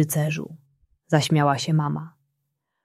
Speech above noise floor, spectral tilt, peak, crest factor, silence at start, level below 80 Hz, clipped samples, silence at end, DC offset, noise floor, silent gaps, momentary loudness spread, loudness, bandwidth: 56 dB; -5.5 dB/octave; -4 dBFS; 22 dB; 0 s; -64 dBFS; under 0.1%; 0.75 s; under 0.1%; -78 dBFS; none; 15 LU; -23 LUFS; 14.5 kHz